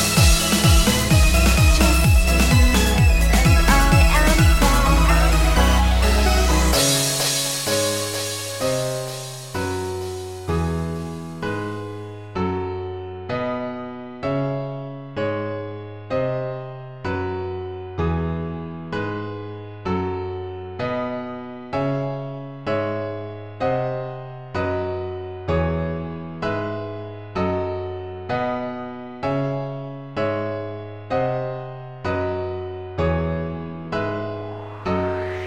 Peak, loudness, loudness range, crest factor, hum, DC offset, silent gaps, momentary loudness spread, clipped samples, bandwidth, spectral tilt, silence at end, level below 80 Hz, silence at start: -2 dBFS; -21 LUFS; 11 LU; 18 dB; none; 0.4%; none; 16 LU; under 0.1%; 17 kHz; -4.5 dB/octave; 0 s; -24 dBFS; 0 s